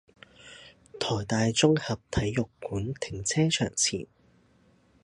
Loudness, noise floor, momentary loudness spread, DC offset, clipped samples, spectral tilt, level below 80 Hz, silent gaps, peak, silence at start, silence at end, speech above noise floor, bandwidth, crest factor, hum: -28 LUFS; -63 dBFS; 24 LU; under 0.1%; under 0.1%; -4 dB/octave; -50 dBFS; none; -6 dBFS; 0.45 s; 1 s; 35 dB; 11.5 kHz; 22 dB; none